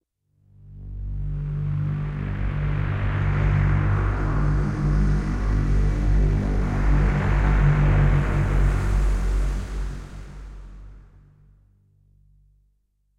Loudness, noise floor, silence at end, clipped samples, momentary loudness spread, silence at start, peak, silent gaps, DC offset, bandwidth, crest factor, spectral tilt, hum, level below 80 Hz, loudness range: -24 LUFS; -67 dBFS; 2.2 s; under 0.1%; 16 LU; 0.65 s; -8 dBFS; none; under 0.1%; 7.8 kHz; 14 dB; -8 dB/octave; 50 Hz at -35 dBFS; -24 dBFS; 9 LU